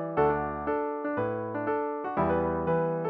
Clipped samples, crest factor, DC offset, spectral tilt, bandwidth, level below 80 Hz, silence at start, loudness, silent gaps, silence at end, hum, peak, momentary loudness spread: under 0.1%; 16 dB; under 0.1%; -7.5 dB/octave; 5 kHz; -50 dBFS; 0 s; -29 LUFS; none; 0 s; none; -12 dBFS; 5 LU